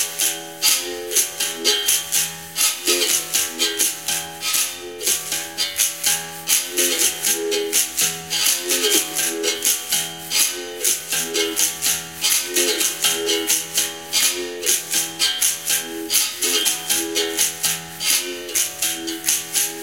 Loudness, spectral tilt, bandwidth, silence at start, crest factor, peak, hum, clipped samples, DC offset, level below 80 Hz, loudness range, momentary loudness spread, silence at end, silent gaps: -18 LUFS; 0.5 dB/octave; 17 kHz; 0 s; 22 dB; 0 dBFS; none; under 0.1%; 0.2%; -62 dBFS; 1 LU; 4 LU; 0 s; none